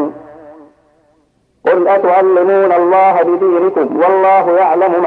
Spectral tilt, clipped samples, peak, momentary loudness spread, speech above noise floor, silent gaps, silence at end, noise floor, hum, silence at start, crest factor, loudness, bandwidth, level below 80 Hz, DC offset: -8 dB/octave; under 0.1%; 0 dBFS; 4 LU; 47 dB; none; 0 s; -56 dBFS; none; 0 s; 12 dB; -11 LUFS; 4.3 kHz; -62 dBFS; under 0.1%